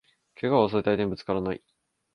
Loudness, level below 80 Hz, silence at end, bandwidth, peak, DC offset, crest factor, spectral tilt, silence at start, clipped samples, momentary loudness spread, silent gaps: -26 LUFS; -56 dBFS; 0.6 s; 6.4 kHz; -8 dBFS; under 0.1%; 20 dB; -8.5 dB/octave; 0.4 s; under 0.1%; 10 LU; none